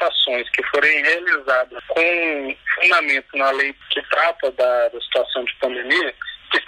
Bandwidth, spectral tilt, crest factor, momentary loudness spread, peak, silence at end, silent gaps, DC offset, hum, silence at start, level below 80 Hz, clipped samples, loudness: 13.5 kHz; -1.5 dB/octave; 14 dB; 9 LU; -4 dBFS; 0.05 s; none; under 0.1%; none; 0 s; -60 dBFS; under 0.1%; -18 LUFS